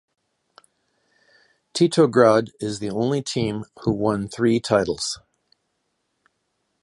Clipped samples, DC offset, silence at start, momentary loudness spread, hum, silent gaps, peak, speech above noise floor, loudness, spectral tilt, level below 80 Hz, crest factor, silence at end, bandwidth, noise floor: under 0.1%; under 0.1%; 1.75 s; 12 LU; none; none; -2 dBFS; 53 dB; -21 LUFS; -5.5 dB/octave; -54 dBFS; 22 dB; 1.65 s; 11.5 kHz; -74 dBFS